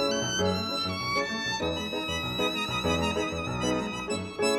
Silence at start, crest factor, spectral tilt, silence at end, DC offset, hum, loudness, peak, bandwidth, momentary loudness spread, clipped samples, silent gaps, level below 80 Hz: 0 s; 14 dB; -3.5 dB/octave; 0 s; under 0.1%; none; -29 LUFS; -14 dBFS; 16.5 kHz; 4 LU; under 0.1%; none; -48 dBFS